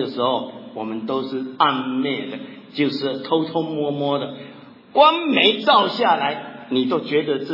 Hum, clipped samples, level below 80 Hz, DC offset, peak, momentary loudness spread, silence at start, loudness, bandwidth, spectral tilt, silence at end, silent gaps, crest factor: none; under 0.1%; -78 dBFS; under 0.1%; -2 dBFS; 16 LU; 0 s; -20 LUFS; 5.8 kHz; -6.5 dB/octave; 0 s; none; 20 dB